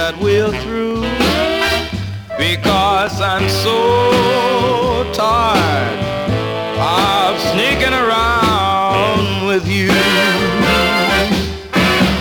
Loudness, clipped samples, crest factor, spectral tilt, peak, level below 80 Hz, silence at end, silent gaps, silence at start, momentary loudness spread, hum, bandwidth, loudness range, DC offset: -14 LUFS; under 0.1%; 12 dB; -4.5 dB/octave; -2 dBFS; -34 dBFS; 0 s; none; 0 s; 6 LU; none; over 20 kHz; 2 LU; under 0.1%